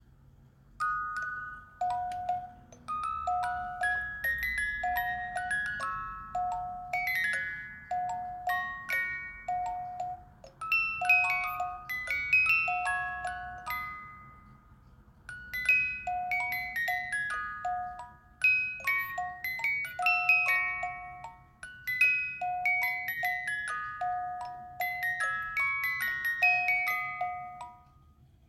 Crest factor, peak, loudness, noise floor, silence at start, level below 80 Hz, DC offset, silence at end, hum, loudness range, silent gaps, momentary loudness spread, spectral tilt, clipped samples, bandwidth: 20 dB; -14 dBFS; -30 LUFS; -60 dBFS; 0.4 s; -58 dBFS; under 0.1%; 0.7 s; none; 6 LU; none; 15 LU; -2.5 dB/octave; under 0.1%; 16 kHz